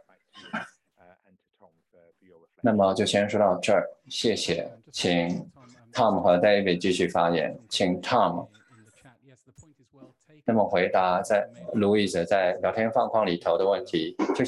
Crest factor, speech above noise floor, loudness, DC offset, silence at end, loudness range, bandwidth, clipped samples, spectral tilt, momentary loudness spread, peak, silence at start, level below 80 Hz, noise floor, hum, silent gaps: 18 dB; 40 dB; -25 LUFS; under 0.1%; 0 s; 5 LU; 12 kHz; under 0.1%; -5 dB/octave; 11 LU; -8 dBFS; 0.35 s; -60 dBFS; -65 dBFS; none; none